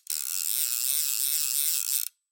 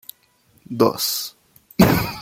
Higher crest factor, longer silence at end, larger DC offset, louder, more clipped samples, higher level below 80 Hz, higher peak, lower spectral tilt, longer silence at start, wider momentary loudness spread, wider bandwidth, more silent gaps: about the same, 22 dB vs 20 dB; first, 0.25 s vs 0 s; neither; second, -25 LUFS vs -19 LUFS; neither; second, under -90 dBFS vs -44 dBFS; second, -8 dBFS vs 0 dBFS; second, 10 dB/octave vs -5 dB/octave; second, 0.1 s vs 0.7 s; second, 4 LU vs 16 LU; about the same, 17.5 kHz vs 17 kHz; neither